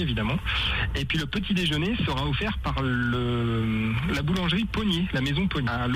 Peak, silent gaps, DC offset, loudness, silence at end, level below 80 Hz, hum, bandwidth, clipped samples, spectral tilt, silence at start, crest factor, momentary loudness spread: -14 dBFS; none; under 0.1%; -26 LUFS; 0 s; -36 dBFS; none; 15.5 kHz; under 0.1%; -6 dB/octave; 0 s; 12 dB; 2 LU